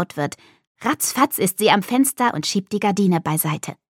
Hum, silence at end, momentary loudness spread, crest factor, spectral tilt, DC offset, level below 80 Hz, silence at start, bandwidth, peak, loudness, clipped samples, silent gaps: none; 0.25 s; 10 LU; 18 dB; -4 dB/octave; under 0.1%; -66 dBFS; 0 s; 17.5 kHz; -2 dBFS; -20 LUFS; under 0.1%; 0.67-0.75 s